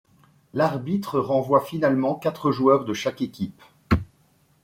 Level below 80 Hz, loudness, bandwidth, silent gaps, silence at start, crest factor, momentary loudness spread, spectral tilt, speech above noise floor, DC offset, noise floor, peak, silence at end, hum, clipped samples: -46 dBFS; -24 LUFS; 16.5 kHz; none; 0.55 s; 18 dB; 10 LU; -7 dB/octave; 39 dB; under 0.1%; -61 dBFS; -6 dBFS; 0.6 s; none; under 0.1%